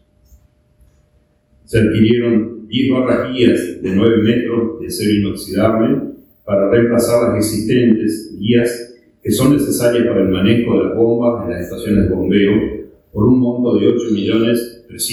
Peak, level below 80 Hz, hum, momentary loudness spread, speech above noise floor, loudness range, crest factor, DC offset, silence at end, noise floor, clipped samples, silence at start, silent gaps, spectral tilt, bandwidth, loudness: 0 dBFS; -40 dBFS; none; 9 LU; 42 dB; 1 LU; 14 dB; under 0.1%; 0 s; -56 dBFS; under 0.1%; 1.7 s; none; -6 dB/octave; 18 kHz; -15 LUFS